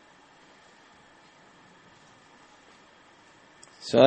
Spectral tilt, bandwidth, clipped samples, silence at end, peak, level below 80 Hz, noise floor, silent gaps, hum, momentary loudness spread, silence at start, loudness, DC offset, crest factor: -5.5 dB/octave; 8.4 kHz; under 0.1%; 0 s; -2 dBFS; -70 dBFS; -56 dBFS; none; none; 5 LU; 3.85 s; -30 LUFS; under 0.1%; 28 dB